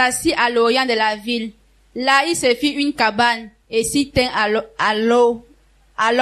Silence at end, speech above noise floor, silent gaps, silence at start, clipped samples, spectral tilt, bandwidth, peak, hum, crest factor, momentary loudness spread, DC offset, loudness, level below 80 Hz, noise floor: 0 s; 35 dB; none; 0 s; under 0.1%; -3 dB/octave; 13.5 kHz; -2 dBFS; none; 16 dB; 9 LU; under 0.1%; -17 LUFS; -46 dBFS; -53 dBFS